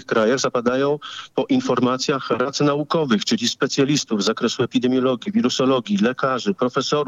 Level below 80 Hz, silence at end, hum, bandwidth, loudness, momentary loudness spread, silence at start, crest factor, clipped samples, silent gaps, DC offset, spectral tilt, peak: -64 dBFS; 0 s; none; 8.6 kHz; -20 LUFS; 3 LU; 0 s; 14 dB; under 0.1%; none; under 0.1%; -4.5 dB/octave; -6 dBFS